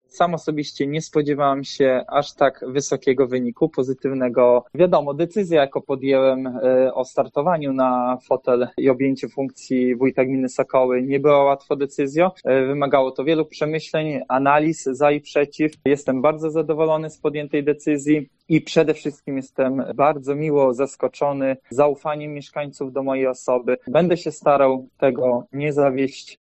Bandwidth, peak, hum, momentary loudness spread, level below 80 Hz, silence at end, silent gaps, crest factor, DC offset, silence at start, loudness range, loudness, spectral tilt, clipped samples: 8.6 kHz; -2 dBFS; none; 7 LU; -64 dBFS; 0.1 s; none; 18 dB; under 0.1%; 0.15 s; 2 LU; -20 LUFS; -6 dB/octave; under 0.1%